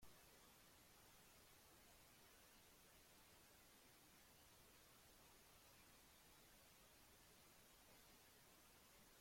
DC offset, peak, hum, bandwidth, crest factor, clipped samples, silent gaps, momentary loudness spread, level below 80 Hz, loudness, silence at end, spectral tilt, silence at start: under 0.1%; -52 dBFS; none; 16.5 kHz; 18 dB; under 0.1%; none; 1 LU; -82 dBFS; -69 LUFS; 0 s; -2 dB/octave; 0 s